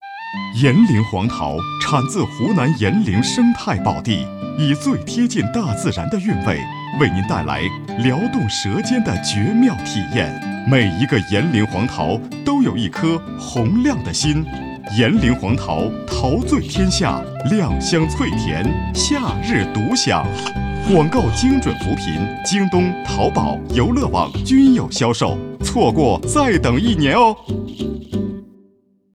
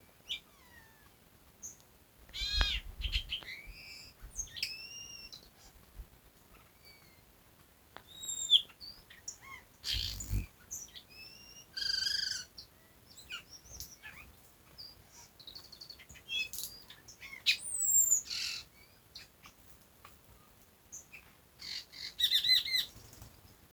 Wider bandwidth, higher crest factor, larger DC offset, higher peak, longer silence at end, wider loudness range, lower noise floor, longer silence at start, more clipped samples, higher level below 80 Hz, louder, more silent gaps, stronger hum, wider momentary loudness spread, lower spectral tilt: second, 12 kHz vs over 20 kHz; second, 16 dB vs 30 dB; neither; first, -2 dBFS vs -8 dBFS; first, 0.65 s vs 0.2 s; second, 3 LU vs 17 LU; second, -56 dBFS vs -63 dBFS; second, 0 s vs 0.25 s; neither; first, -34 dBFS vs -50 dBFS; first, -18 LUFS vs -33 LUFS; neither; neither; second, 8 LU vs 27 LU; first, -5.5 dB/octave vs 0.5 dB/octave